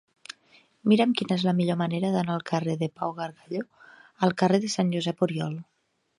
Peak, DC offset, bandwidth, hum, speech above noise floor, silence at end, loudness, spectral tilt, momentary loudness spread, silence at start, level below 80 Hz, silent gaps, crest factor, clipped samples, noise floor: -8 dBFS; under 0.1%; 11.5 kHz; none; 35 dB; 0.55 s; -26 LUFS; -6 dB/octave; 17 LU; 0.85 s; -72 dBFS; none; 20 dB; under 0.1%; -60 dBFS